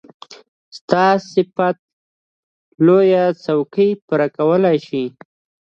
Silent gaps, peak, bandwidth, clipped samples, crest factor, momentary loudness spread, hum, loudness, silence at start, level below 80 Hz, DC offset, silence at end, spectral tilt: 0.48-0.72 s, 0.81-0.88 s, 1.79-2.72 s, 4.02-4.08 s; 0 dBFS; 7.4 kHz; under 0.1%; 18 dB; 12 LU; none; -16 LUFS; 0.3 s; -66 dBFS; under 0.1%; 0.65 s; -7.5 dB/octave